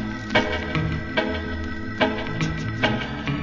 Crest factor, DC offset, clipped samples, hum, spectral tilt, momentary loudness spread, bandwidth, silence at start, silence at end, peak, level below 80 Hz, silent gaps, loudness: 20 dB; under 0.1%; under 0.1%; none; -6 dB/octave; 6 LU; 7.6 kHz; 0 s; 0 s; -6 dBFS; -38 dBFS; none; -25 LUFS